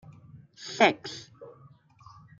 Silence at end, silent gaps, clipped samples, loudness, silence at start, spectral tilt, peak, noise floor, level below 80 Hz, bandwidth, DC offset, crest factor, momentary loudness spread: 0.9 s; none; under 0.1%; -26 LUFS; 0.1 s; -3.5 dB/octave; -8 dBFS; -56 dBFS; -72 dBFS; 7.6 kHz; under 0.1%; 24 dB; 26 LU